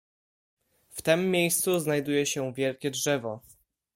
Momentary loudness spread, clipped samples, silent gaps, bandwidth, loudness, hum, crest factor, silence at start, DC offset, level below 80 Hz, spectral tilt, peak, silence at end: 10 LU; under 0.1%; none; 16.5 kHz; -27 LUFS; none; 18 dB; 0.95 s; under 0.1%; -68 dBFS; -4 dB/octave; -10 dBFS; 0.55 s